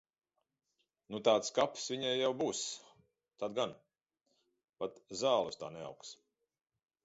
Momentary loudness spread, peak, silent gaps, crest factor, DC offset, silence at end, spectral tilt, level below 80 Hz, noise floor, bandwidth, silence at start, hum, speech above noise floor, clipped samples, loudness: 16 LU; -14 dBFS; 4.69-4.73 s; 24 dB; under 0.1%; 0.9 s; -2.5 dB/octave; -80 dBFS; -87 dBFS; 8 kHz; 1.1 s; none; 51 dB; under 0.1%; -36 LUFS